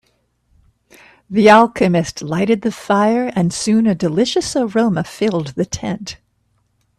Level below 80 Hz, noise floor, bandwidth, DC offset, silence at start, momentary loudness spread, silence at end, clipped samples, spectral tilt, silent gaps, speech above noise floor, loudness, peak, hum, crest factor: -50 dBFS; -63 dBFS; 13 kHz; under 0.1%; 1.3 s; 12 LU; 0.85 s; under 0.1%; -5.5 dB/octave; none; 48 dB; -16 LUFS; 0 dBFS; none; 16 dB